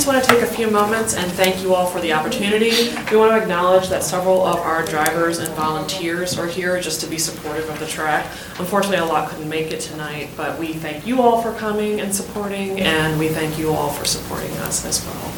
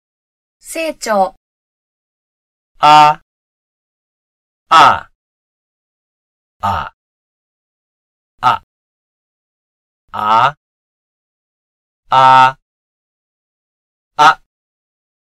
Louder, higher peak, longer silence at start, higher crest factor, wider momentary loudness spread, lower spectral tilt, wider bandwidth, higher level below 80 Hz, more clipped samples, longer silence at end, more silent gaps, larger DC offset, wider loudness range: second, -19 LUFS vs -11 LUFS; about the same, 0 dBFS vs 0 dBFS; second, 0 s vs 0.65 s; about the same, 20 dB vs 16 dB; second, 10 LU vs 16 LU; about the same, -3.5 dB/octave vs -3.5 dB/octave; first, 19 kHz vs 14.5 kHz; about the same, -46 dBFS vs -50 dBFS; second, under 0.1% vs 0.2%; second, 0 s vs 0.95 s; second, none vs 1.37-2.75 s, 3.22-4.66 s, 5.15-6.60 s, 6.94-8.38 s, 8.63-10.08 s, 10.57-12.03 s, 12.62-14.11 s; neither; second, 5 LU vs 10 LU